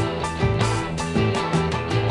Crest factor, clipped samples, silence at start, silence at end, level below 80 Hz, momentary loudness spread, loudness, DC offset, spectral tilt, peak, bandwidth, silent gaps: 14 dB; under 0.1%; 0 s; 0 s; -40 dBFS; 3 LU; -23 LUFS; under 0.1%; -6 dB/octave; -8 dBFS; 11.5 kHz; none